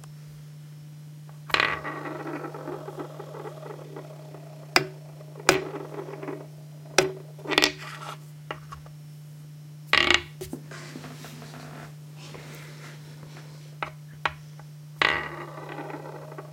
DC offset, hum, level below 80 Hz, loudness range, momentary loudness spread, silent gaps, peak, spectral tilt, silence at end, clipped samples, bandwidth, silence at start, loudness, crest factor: under 0.1%; none; -60 dBFS; 11 LU; 21 LU; none; 0 dBFS; -3 dB/octave; 0 s; under 0.1%; 16.5 kHz; 0 s; -28 LUFS; 32 dB